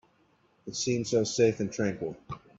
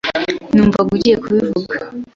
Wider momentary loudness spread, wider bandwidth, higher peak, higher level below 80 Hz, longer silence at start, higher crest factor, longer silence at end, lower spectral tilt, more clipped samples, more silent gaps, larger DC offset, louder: first, 14 LU vs 9 LU; about the same, 8 kHz vs 7.4 kHz; second, -12 dBFS vs -2 dBFS; second, -64 dBFS vs -42 dBFS; first, 0.65 s vs 0.05 s; first, 20 dB vs 14 dB; about the same, 0.2 s vs 0.1 s; second, -4.5 dB/octave vs -6.5 dB/octave; neither; neither; neither; second, -29 LUFS vs -15 LUFS